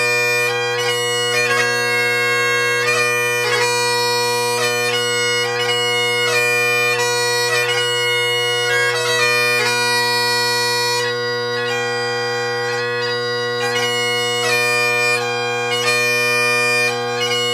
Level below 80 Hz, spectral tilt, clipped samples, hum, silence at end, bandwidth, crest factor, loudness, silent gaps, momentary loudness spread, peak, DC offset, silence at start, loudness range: -68 dBFS; -1.5 dB/octave; under 0.1%; none; 0 s; 16 kHz; 14 dB; -16 LUFS; none; 5 LU; -2 dBFS; under 0.1%; 0 s; 3 LU